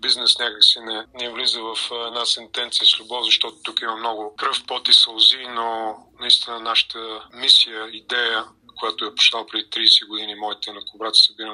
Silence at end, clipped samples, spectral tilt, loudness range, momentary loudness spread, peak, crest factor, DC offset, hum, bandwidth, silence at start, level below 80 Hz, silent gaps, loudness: 0 s; under 0.1%; 1 dB/octave; 3 LU; 15 LU; 0 dBFS; 20 dB; under 0.1%; none; 11.5 kHz; 0 s; -68 dBFS; none; -17 LUFS